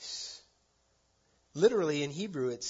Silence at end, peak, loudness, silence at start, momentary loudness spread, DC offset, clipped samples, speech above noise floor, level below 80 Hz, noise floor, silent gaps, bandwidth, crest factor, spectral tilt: 0 s; -14 dBFS; -31 LUFS; 0 s; 18 LU; under 0.1%; under 0.1%; 42 dB; -74 dBFS; -72 dBFS; none; 7.6 kHz; 20 dB; -4.5 dB/octave